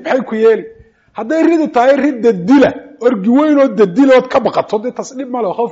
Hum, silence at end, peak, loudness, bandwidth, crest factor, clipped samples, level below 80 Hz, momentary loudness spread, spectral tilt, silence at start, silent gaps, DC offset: none; 0 s; -2 dBFS; -12 LUFS; 7.8 kHz; 10 dB; under 0.1%; -54 dBFS; 9 LU; -5 dB/octave; 0 s; none; under 0.1%